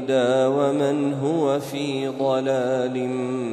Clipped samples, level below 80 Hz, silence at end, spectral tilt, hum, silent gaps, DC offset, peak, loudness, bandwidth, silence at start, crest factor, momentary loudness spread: under 0.1%; -68 dBFS; 0 s; -6 dB/octave; none; none; under 0.1%; -8 dBFS; -22 LUFS; 13.5 kHz; 0 s; 14 dB; 6 LU